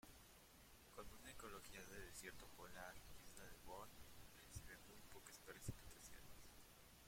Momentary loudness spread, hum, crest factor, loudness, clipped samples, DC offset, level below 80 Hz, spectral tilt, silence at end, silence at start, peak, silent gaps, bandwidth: 9 LU; none; 22 dB; -60 LUFS; under 0.1%; under 0.1%; -68 dBFS; -3.5 dB/octave; 0 s; 0.05 s; -38 dBFS; none; 16.5 kHz